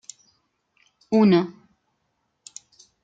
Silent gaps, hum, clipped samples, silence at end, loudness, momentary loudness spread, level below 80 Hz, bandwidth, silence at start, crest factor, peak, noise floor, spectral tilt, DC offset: none; none; under 0.1%; 1.55 s; -20 LUFS; 26 LU; -68 dBFS; 9 kHz; 1.1 s; 18 dB; -8 dBFS; -74 dBFS; -6.5 dB/octave; under 0.1%